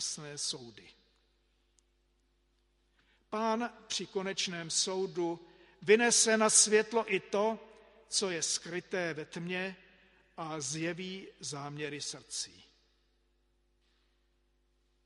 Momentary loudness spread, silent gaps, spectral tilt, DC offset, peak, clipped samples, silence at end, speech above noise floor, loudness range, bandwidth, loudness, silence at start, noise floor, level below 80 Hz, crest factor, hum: 17 LU; none; -2 dB/octave; under 0.1%; -12 dBFS; under 0.1%; 2.55 s; 41 dB; 15 LU; 11.5 kHz; -32 LUFS; 0 s; -74 dBFS; -74 dBFS; 24 dB; none